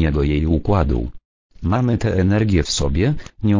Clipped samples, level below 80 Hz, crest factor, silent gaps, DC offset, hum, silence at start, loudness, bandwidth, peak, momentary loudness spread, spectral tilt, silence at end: under 0.1%; -26 dBFS; 16 dB; 1.25-1.50 s; under 0.1%; none; 0 s; -19 LUFS; 7.8 kHz; -2 dBFS; 6 LU; -6.5 dB/octave; 0 s